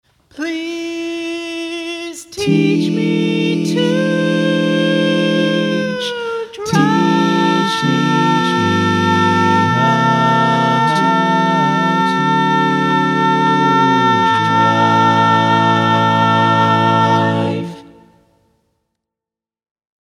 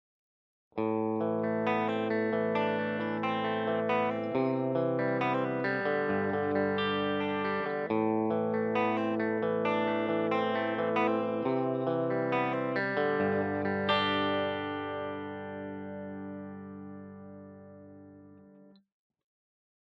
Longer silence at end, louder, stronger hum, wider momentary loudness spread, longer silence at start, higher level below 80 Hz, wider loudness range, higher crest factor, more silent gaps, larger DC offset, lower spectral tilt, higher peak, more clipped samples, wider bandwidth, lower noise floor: first, 2.3 s vs 1.3 s; first, -14 LUFS vs -31 LUFS; neither; about the same, 10 LU vs 12 LU; second, 0.35 s vs 0.75 s; first, -60 dBFS vs -76 dBFS; second, 5 LU vs 12 LU; about the same, 14 dB vs 18 dB; neither; neither; second, -5.5 dB/octave vs -8 dB/octave; first, 0 dBFS vs -14 dBFS; neither; first, 13.5 kHz vs 6.4 kHz; first, -87 dBFS vs -57 dBFS